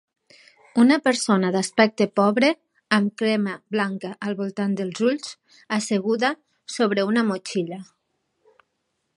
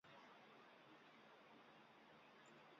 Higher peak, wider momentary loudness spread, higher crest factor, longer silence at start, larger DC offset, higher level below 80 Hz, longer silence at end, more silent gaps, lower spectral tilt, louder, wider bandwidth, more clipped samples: first, -2 dBFS vs -54 dBFS; first, 11 LU vs 2 LU; first, 20 dB vs 14 dB; first, 0.75 s vs 0.05 s; neither; first, -74 dBFS vs under -90 dBFS; first, 1.35 s vs 0 s; neither; first, -5 dB/octave vs -2 dB/octave; first, -22 LUFS vs -66 LUFS; first, 11.5 kHz vs 7 kHz; neither